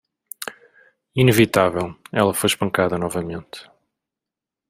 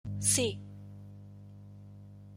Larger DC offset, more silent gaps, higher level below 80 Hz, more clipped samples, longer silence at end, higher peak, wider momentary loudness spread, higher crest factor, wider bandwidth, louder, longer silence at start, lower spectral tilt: neither; neither; first, -54 dBFS vs -62 dBFS; neither; first, 1.05 s vs 0 s; first, -2 dBFS vs -14 dBFS; second, 18 LU vs 24 LU; about the same, 20 dB vs 22 dB; about the same, 16 kHz vs 16 kHz; first, -20 LUFS vs -29 LUFS; first, 0.4 s vs 0.05 s; first, -5 dB/octave vs -3 dB/octave